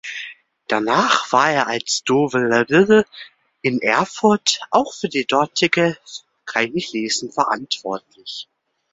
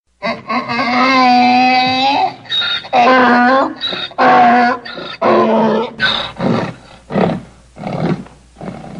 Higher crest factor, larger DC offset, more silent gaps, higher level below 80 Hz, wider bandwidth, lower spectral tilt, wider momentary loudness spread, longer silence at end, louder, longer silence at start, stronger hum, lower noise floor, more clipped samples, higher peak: about the same, 18 dB vs 14 dB; neither; neither; second, -60 dBFS vs -50 dBFS; second, 8 kHz vs 9.4 kHz; second, -3.5 dB/octave vs -5.5 dB/octave; about the same, 16 LU vs 14 LU; first, 0.5 s vs 0 s; second, -18 LUFS vs -13 LUFS; second, 0.05 s vs 0.2 s; neither; first, -38 dBFS vs -32 dBFS; neither; about the same, 0 dBFS vs 0 dBFS